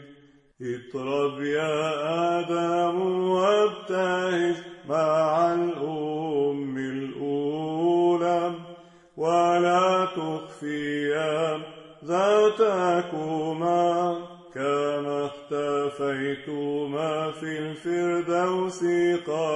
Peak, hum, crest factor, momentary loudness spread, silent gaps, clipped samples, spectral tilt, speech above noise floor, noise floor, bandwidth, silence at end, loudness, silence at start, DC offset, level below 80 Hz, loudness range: -8 dBFS; none; 16 dB; 10 LU; none; under 0.1%; -6 dB/octave; 30 dB; -54 dBFS; 10.5 kHz; 0 s; -25 LUFS; 0 s; under 0.1%; -72 dBFS; 3 LU